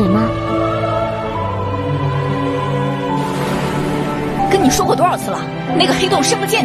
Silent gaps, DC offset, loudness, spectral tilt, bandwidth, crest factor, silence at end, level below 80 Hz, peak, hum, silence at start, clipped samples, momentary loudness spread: none; under 0.1%; -16 LUFS; -5 dB/octave; 13.5 kHz; 16 dB; 0 s; -38 dBFS; 0 dBFS; none; 0 s; under 0.1%; 7 LU